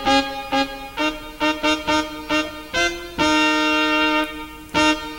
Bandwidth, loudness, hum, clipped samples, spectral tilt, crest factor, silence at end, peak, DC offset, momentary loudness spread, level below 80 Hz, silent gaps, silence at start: 16.5 kHz; -20 LUFS; none; under 0.1%; -2.5 dB/octave; 16 dB; 0 s; -4 dBFS; under 0.1%; 7 LU; -42 dBFS; none; 0 s